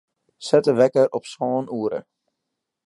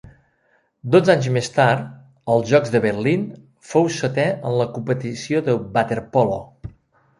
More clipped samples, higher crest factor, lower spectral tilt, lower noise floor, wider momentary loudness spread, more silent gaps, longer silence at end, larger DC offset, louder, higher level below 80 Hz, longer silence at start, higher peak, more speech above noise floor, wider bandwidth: neither; about the same, 20 dB vs 18 dB; about the same, -6 dB/octave vs -6 dB/octave; first, -81 dBFS vs -63 dBFS; second, 12 LU vs 15 LU; neither; first, 0.85 s vs 0.5 s; neither; about the same, -21 LUFS vs -20 LUFS; second, -72 dBFS vs -54 dBFS; second, 0.4 s vs 0.85 s; about the same, -2 dBFS vs -2 dBFS; first, 61 dB vs 45 dB; about the same, 11.5 kHz vs 11.5 kHz